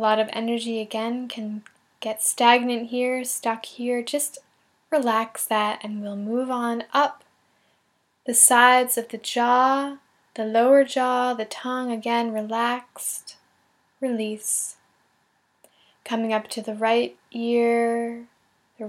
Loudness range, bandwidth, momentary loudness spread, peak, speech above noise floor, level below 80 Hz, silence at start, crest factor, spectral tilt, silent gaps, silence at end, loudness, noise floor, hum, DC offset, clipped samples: 9 LU; 17 kHz; 14 LU; 0 dBFS; 46 dB; -86 dBFS; 0 s; 24 dB; -2 dB/octave; none; 0 s; -23 LUFS; -68 dBFS; none; under 0.1%; under 0.1%